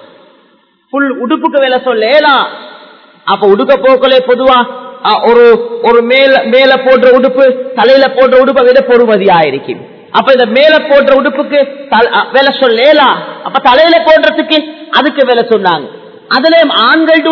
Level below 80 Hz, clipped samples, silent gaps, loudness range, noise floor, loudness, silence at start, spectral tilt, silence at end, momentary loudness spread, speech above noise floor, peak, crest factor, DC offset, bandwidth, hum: -48 dBFS; 3%; none; 3 LU; -49 dBFS; -7 LUFS; 0.95 s; -6 dB/octave; 0 s; 8 LU; 42 dB; 0 dBFS; 8 dB; under 0.1%; 5.4 kHz; none